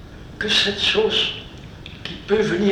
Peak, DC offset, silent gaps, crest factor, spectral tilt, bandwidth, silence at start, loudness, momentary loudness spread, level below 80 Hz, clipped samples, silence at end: -4 dBFS; under 0.1%; none; 18 dB; -3.5 dB/octave; 12.5 kHz; 0 s; -19 LUFS; 21 LU; -44 dBFS; under 0.1%; 0 s